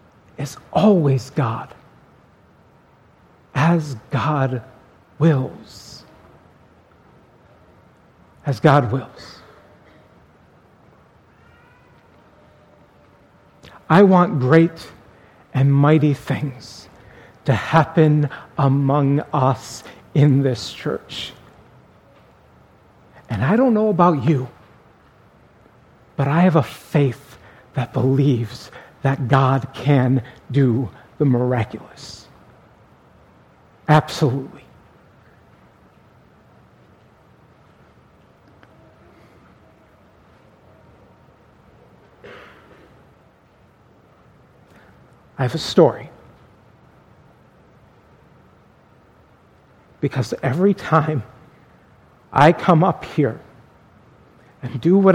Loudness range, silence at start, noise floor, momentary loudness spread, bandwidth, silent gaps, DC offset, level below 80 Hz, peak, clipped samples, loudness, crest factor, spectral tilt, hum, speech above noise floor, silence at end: 7 LU; 0.4 s; -53 dBFS; 22 LU; 12 kHz; none; under 0.1%; -56 dBFS; 0 dBFS; under 0.1%; -18 LUFS; 22 dB; -7.5 dB/octave; none; 36 dB; 0 s